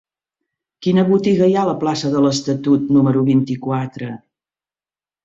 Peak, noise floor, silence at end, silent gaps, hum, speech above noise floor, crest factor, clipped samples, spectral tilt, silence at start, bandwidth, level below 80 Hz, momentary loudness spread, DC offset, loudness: -4 dBFS; under -90 dBFS; 1.05 s; none; none; over 74 dB; 14 dB; under 0.1%; -7 dB/octave; 0.8 s; 7.8 kHz; -58 dBFS; 11 LU; under 0.1%; -17 LUFS